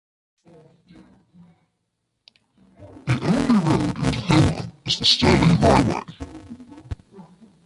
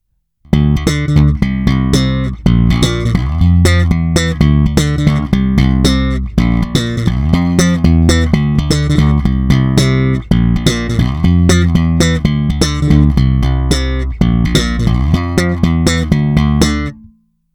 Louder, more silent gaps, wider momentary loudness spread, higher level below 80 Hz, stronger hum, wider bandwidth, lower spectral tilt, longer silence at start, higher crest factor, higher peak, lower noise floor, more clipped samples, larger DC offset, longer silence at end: second, -19 LUFS vs -12 LUFS; neither; first, 22 LU vs 4 LU; second, -38 dBFS vs -18 dBFS; neither; second, 11.5 kHz vs 18.5 kHz; about the same, -5.5 dB/octave vs -6 dB/octave; first, 2.8 s vs 0.5 s; first, 20 dB vs 12 dB; about the same, -2 dBFS vs 0 dBFS; first, -75 dBFS vs -48 dBFS; neither; neither; about the same, 0.45 s vs 0.45 s